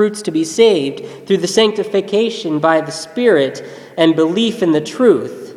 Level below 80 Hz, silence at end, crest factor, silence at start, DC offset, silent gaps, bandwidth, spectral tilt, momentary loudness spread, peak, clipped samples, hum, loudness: -62 dBFS; 0 s; 14 dB; 0 s; under 0.1%; none; 13.5 kHz; -4.5 dB/octave; 8 LU; 0 dBFS; under 0.1%; none; -15 LUFS